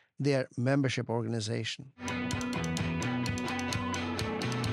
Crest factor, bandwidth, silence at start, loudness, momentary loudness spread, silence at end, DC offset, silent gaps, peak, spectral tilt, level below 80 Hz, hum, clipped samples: 18 dB; 14.5 kHz; 0.2 s; -33 LUFS; 5 LU; 0 s; under 0.1%; none; -14 dBFS; -5.5 dB/octave; -56 dBFS; none; under 0.1%